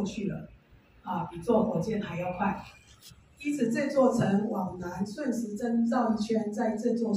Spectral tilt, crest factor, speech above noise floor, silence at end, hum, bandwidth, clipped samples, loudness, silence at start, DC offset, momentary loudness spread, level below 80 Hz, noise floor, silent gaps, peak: -7 dB/octave; 18 dB; 29 dB; 0 s; none; 14.5 kHz; under 0.1%; -29 LUFS; 0 s; under 0.1%; 11 LU; -60 dBFS; -58 dBFS; none; -12 dBFS